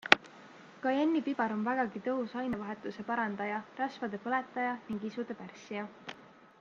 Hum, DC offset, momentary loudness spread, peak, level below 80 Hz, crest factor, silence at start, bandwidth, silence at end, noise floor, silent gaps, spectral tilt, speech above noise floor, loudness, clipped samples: none; under 0.1%; 15 LU; -2 dBFS; -74 dBFS; 34 dB; 0.05 s; 9.2 kHz; 0.15 s; -55 dBFS; none; -5 dB/octave; 20 dB; -34 LUFS; under 0.1%